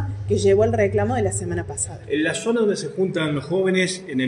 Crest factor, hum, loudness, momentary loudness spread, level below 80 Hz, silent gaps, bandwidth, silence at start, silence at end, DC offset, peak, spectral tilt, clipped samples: 16 dB; none; -21 LUFS; 8 LU; -46 dBFS; none; 11 kHz; 0 s; 0 s; under 0.1%; -6 dBFS; -5 dB/octave; under 0.1%